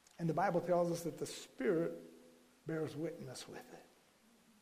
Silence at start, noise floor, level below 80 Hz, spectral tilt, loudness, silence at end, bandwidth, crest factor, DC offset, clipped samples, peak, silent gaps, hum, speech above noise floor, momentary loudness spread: 0.2 s; -69 dBFS; -76 dBFS; -6 dB/octave; -39 LUFS; 0.8 s; 15.5 kHz; 18 dB; under 0.1%; under 0.1%; -22 dBFS; none; none; 30 dB; 18 LU